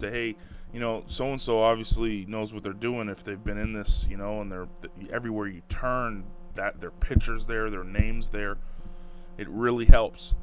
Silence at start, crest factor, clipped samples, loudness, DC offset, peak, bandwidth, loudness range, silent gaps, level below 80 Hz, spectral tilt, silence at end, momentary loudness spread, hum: 0 s; 24 dB; under 0.1%; -30 LUFS; under 0.1%; 0 dBFS; 4 kHz; 5 LU; none; -30 dBFS; -10.5 dB/octave; 0 s; 18 LU; none